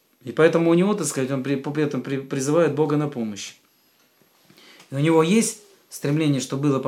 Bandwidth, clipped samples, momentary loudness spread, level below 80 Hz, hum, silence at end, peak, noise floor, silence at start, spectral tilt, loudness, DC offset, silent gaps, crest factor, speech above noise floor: 16 kHz; under 0.1%; 13 LU; -78 dBFS; none; 0 s; -2 dBFS; -61 dBFS; 0.25 s; -5.5 dB/octave; -22 LUFS; under 0.1%; none; 20 dB; 40 dB